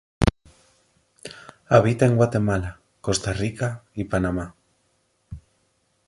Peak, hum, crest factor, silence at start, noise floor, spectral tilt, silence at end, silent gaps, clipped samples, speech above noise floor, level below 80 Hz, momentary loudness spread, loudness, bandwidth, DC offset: -2 dBFS; none; 22 dB; 0.2 s; -68 dBFS; -6 dB/octave; 0.7 s; none; under 0.1%; 47 dB; -40 dBFS; 24 LU; -23 LUFS; 11.5 kHz; under 0.1%